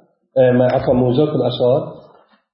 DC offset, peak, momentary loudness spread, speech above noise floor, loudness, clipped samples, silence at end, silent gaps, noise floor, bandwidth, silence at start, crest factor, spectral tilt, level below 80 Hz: under 0.1%; -2 dBFS; 7 LU; 35 dB; -16 LUFS; under 0.1%; 0.55 s; none; -49 dBFS; 5.8 kHz; 0.35 s; 14 dB; -12.5 dB/octave; -46 dBFS